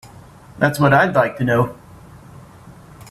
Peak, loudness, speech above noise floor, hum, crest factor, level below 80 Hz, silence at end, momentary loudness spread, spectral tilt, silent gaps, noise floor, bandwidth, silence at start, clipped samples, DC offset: -2 dBFS; -17 LUFS; 26 dB; none; 18 dB; -50 dBFS; 0.95 s; 6 LU; -6.5 dB/octave; none; -42 dBFS; 14 kHz; 0.05 s; under 0.1%; under 0.1%